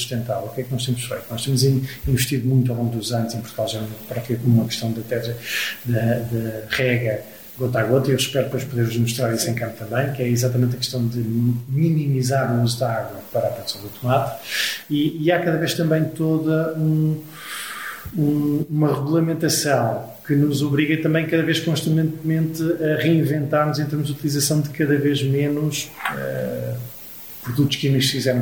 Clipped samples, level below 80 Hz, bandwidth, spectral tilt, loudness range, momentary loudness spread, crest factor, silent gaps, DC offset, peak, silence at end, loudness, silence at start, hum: under 0.1%; -50 dBFS; over 20 kHz; -5.5 dB/octave; 3 LU; 8 LU; 16 dB; none; 0.2%; -4 dBFS; 0 s; -21 LUFS; 0 s; none